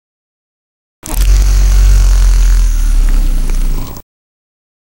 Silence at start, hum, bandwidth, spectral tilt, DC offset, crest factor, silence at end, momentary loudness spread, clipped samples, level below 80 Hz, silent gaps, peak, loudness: 1.05 s; none; 16.5 kHz; -4.5 dB/octave; under 0.1%; 10 dB; 1 s; 13 LU; under 0.1%; -10 dBFS; none; 0 dBFS; -13 LUFS